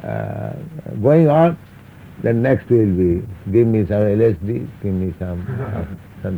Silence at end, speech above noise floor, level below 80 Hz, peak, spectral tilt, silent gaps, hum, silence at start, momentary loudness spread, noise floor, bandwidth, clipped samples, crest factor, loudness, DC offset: 0 s; 23 dB; -46 dBFS; -2 dBFS; -10.5 dB/octave; none; none; 0 s; 15 LU; -40 dBFS; over 20 kHz; under 0.1%; 16 dB; -18 LUFS; under 0.1%